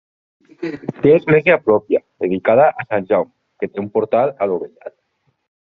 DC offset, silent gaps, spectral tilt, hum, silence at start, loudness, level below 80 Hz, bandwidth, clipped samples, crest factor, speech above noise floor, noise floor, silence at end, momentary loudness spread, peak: under 0.1%; none; -6 dB/octave; none; 0.6 s; -16 LUFS; -58 dBFS; 5 kHz; under 0.1%; 16 dB; 50 dB; -67 dBFS; 0.75 s; 16 LU; 0 dBFS